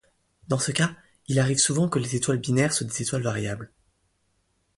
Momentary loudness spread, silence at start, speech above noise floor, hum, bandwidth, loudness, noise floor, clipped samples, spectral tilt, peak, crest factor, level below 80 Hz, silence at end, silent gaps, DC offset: 11 LU; 0.5 s; 46 dB; none; 11.5 kHz; -25 LUFS; -70 dBFS; under 0.1%; -4 dB/octave; -8 dBFS; 18 dB; -58 dBFS; 1.1 s; none; under 0.1%